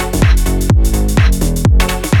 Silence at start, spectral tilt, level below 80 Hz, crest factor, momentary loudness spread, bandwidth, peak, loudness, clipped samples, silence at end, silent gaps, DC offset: 0 s; -5.5 dB/octave; -12 dBFS; 10 dB; 1 LU; 18 kHz; 0 dBFS; -13 LUFS; under 0.1%; 0 s; none; under 0.1%